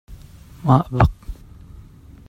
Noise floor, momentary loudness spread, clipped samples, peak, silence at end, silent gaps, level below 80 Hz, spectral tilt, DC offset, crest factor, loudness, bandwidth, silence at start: -43 dBFS; 23 LU; under 0.1%; 0 dBFS; 0.5 s; none; -34 dBFS; -9 dB/octave; under 0.1%; 22 dB; -19 LUFS; 7.8 kHz; 0.1 s